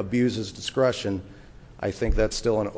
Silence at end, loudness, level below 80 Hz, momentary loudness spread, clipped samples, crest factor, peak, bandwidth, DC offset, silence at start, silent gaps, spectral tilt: 0 s; -26 LUFS; -36 dBFS; 9 LU; under 0.1%; 16 dB; -10 dBFS; 8 kHz; under 0.1%; 0 s; none; -5.5 dB/octave